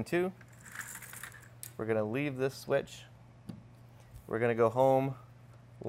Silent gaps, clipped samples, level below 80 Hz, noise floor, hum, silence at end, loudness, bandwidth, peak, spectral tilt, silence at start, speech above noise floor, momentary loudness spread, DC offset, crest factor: none; under 0.1%; -66 dBFS; -55 dBFS; none; 0 s; -33 LUFS; 16 kHz; -14 dBFS; -6 dB/octave; 0 s; 24 dB; 23 LU; under 0.1%; 20 dB